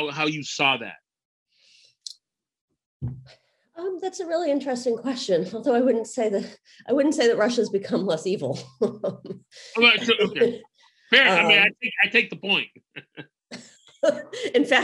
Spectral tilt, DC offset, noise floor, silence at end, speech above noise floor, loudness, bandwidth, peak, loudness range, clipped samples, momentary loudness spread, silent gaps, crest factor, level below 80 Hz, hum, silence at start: -3.5 dB/octave; under 0.1%; -65 dBFS; 0 s; 42 dB; -22 LUFS; 15 kHz; -2 dBFS; 12 LU; under 0.1%; 23 LU; 1.25-1.46 s, 2.61-2.68 s, 2.86-3.00 s; 22 dB; -64 dBFS; none; 0 s